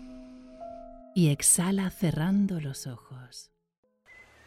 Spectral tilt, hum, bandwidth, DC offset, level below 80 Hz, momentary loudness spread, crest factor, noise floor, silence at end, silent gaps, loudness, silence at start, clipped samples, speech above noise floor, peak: -4.5 dB/octave; none; 16 kHz; under 0.1%; -56 dBFS; 25 LU; 20 dB; -56 dBFS; 1.05 s; none; -26 LUFS; 0 s; under 0.1%; 29 dB; -8 dBFS